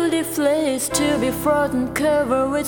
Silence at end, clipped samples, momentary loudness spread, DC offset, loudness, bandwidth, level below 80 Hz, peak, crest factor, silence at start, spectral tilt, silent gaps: 0 s; under 0.1%; 2 LU; 0.1%; -20 LUFS; 19.5 kHz; -44 dBFS; -4 dBFS; 16 dB; 0 s; -4 dB/octave; none